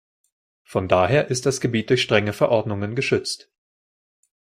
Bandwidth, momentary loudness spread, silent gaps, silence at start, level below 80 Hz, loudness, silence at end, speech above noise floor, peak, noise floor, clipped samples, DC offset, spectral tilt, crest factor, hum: 16 kHz; 9 LU; none; 0.7 s; -58 dBFS; -21 LUFS; 1.15 s; over 69 dB; -2 dBFS; under -90 dBFS; under 0.1%; under 0.1%; -5 dB/octave; 20 dB; none